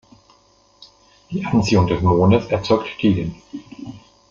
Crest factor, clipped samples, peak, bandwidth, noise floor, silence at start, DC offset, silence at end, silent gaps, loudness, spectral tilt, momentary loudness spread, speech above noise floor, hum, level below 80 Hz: 18 dB; under 0.1%; -2 dBFS; 7.6 kHz; -55 dBFS; 1.3 s; under 0.1%; 0.3 s; none; -18 LUFS; -7 dB/octave; 21 LU; 37 dB; none; -46 dBFS